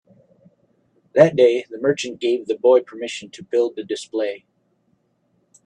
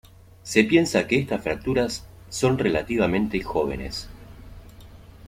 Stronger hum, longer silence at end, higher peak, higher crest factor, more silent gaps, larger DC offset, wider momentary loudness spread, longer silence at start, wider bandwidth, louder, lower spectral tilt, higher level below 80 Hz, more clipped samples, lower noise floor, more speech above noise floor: neither; first, 1.3 s vs 0 s; first, 0 dBFS vs -4 dBFS; about the same, 20 dB vs 20 dB; neither; neither; about the same, 15 LU vs 16 LU; first, 1.15 s vs 0.45 s; second, 10 kHz vs 16 kHz; first, -20 LUFS vs -23 LUFS; about the same, -5.5 dB/octave vs -5 dB/octave; second, -68 dBFS vs -44 dBFS; neither; first, -66 dBFS vs -45 dBFS; first, 47 dB vs 22 dB